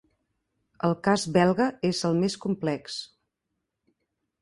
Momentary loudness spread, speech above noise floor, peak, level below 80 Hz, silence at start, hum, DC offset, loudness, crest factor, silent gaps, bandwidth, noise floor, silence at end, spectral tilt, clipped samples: 10 LU; 57 dB; -8 dBFS; -64 dBFS; 0.85 s; none; under 0.1%; -26 LUFS; 20 dB; none; 11.5 kHz; -82 dBFS; 1.35 s; -5.5 dB/octave; under 0.1%